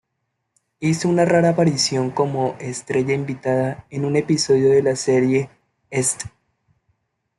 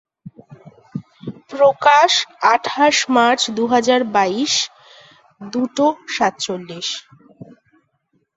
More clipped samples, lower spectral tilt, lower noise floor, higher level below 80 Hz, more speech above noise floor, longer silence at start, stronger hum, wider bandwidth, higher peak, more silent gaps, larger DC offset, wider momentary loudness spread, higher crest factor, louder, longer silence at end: neither; first, -5 dB/octave vs -2.5 dB/octave; first, -75 dBFS vs -66 dBFS; first, -58 dBFS vs -64 dBFS; first, 57 dB vs 49 dB; first, 0.8 s vs 0.25 s; neither; first, 12 kHz vs 8.2 kHz; about the same, -4 dBFS vs -2 dBFS; neither; neither; second, 10 LU vs 18 LU; about the same, 16 dB vs 18 dB; second, -19 LUFS vs -16 LUFS; first, 1.1 s vs 0.9 s